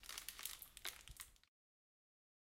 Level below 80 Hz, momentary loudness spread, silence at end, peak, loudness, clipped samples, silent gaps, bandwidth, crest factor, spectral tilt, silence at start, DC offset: -70 dBFS; 8 LU; 1.1 s; -22 dBFS; -51 LUFS; under 0.1%; none; 17 kHz; 34 dB; 0.5 dB/octave; 0 s; under 0.1%